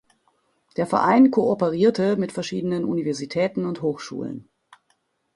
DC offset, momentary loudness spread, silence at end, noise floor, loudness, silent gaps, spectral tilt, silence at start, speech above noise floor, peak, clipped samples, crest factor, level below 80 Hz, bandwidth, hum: under 0.1%; 15 LU; 0.95 s; -69 dBFS; -22 LUFS; none; -6.5 dB/octave; 0.8 s; 48 dB; -4 dBFS; under 0.1%; 18 dB; -62 dBFS; 11.5 kHz; none